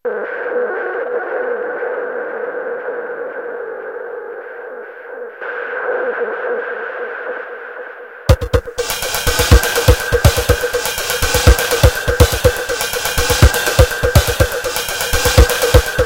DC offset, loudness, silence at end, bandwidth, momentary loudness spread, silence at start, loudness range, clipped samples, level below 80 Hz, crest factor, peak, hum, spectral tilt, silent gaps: under 0.1%; -16 LUFS; 0 s; 17.5 kHz; 15 LU; 0.05 s; 11 LU; 0.3%; -22 dBFS; 16 dB; 0 dBFS; none; -4 dB/octave; none